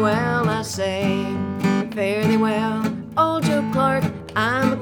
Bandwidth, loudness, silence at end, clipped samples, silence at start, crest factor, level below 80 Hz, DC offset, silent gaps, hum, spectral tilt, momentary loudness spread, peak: 19 kHz; -21 LUFS; 0 s; under 0.1%; 0 s; 16 dB; -50 dBFS; under 0.1%; none; none; -6 dB/octave; 5 LU; -4 dBFS